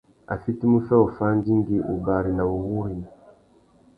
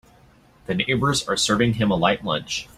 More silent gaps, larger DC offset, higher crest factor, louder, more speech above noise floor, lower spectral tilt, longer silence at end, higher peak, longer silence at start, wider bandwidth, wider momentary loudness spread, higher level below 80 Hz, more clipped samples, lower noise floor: neither; neither; about the same, 20 dB vs 20 dB; about the same, -23 LUFS vs -21 LUFS; about the same, 35 dB vs 32 dB; first, -12 dB/octave vs -4 dB/octave; first, 0.9 s vs 0.1 s; about the same, -4 dBFS vs -4 dBFS; second, 0.3 s vs 0.7 s; second, 4.9 kHz vs 15.5 kHz; first, 13 LU vs 6 LU; about the same, -46 dBFS vs -48 dBFS; neither; first, -57 dBFS vs -53 dBFS